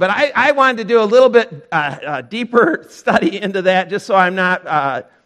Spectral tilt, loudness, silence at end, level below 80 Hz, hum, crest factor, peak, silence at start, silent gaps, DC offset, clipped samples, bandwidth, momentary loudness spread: -5.5 dB/octave; -15 LUFS; 0.25 s; -60 dBFS; none; 14 dB; 0 dBFS; 0 s; none; under 0.1%; under 0.1%; 10.5 kHz; 10 LU